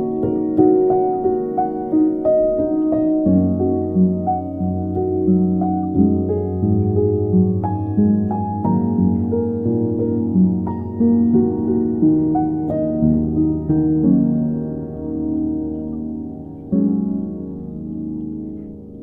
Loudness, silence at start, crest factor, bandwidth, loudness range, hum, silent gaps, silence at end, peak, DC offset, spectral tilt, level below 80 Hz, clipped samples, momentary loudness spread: -18 LUFS; 0 s; 16 dB; 2 kHz; 5 LU; none; none; 0 s; -2 dBFS; under 0.1%; -14.5 dB/octave; -42 dBFS; under 0.1%; 11 LU